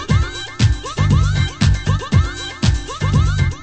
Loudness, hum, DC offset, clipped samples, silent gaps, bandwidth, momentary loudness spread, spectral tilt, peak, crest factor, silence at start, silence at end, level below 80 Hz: -18 LUFS; none; under 0.1%; under 0.1%; none; 8.8 kHz; 4 LU; -5.5 dB/octave; -2 dBFS; 14 dB; 0 s; 0 s; -22 dBFS